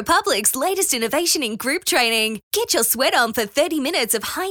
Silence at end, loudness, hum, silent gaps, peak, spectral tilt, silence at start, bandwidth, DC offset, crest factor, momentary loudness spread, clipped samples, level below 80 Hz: 0 s; -19 LUFS; none; 2.43-2.51 s; -2 dBFS; -1 dB/octave; 0 s; over 20 kHz; under 0.1%; 18 dB; 5 LU; under 0.1%; -56 dBFS